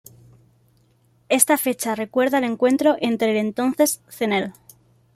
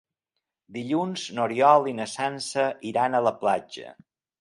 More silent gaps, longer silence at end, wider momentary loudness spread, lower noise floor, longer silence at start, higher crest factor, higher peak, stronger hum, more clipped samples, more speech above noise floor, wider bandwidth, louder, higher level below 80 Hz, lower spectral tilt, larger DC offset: neither; first, 0.65 s vs 0.5 s; second, 7 LU vs 16 LU; second, -60 dBFS vs -84 dBFS; first, 1.3 s vs 0.7 s; about the same, 22 dB vs 22 dB; first, 0 dBFS vs -4 dBFS; neither; neither; second, 40 dB vs 59 dB; first, 16 kHz vs 11.5 kHz; first, -20 LUFS vs -24 LUFS; first, -66 dBFS vs -74 dBFS; second, -3 dB/octave vs -4.5 dB/octave; neither